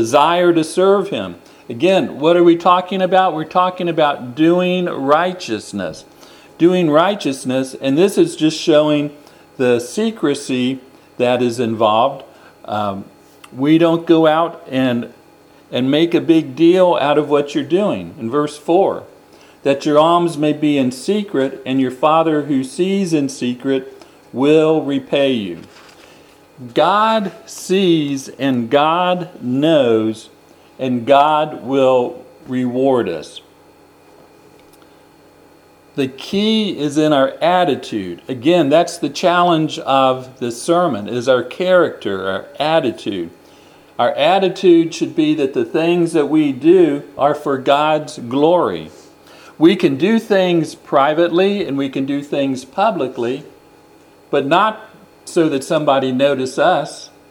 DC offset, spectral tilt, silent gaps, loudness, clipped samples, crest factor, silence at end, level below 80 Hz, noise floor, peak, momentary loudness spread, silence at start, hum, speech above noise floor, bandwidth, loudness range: under 0.1%; -5.5 dB/octave; none; -16 LUFS; under 0.1%; 16 dB; 0.25 s; -64 dBFS; -47 dBFS; 0 dBFS; 11 LU; 0 s; none; 32 dB; 13.5 kHz; 4 LU